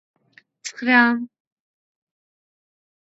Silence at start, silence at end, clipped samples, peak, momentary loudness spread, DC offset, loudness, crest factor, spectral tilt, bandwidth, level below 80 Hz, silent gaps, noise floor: 0.65 s; 1.9 s; under 0.1%; -2 dBFS; 20 LU; under 0.1%; -18 LUFS; 24 dB; -3 dB/octave; 8.2 kHz; -82 dBFS; none; -48 dBFS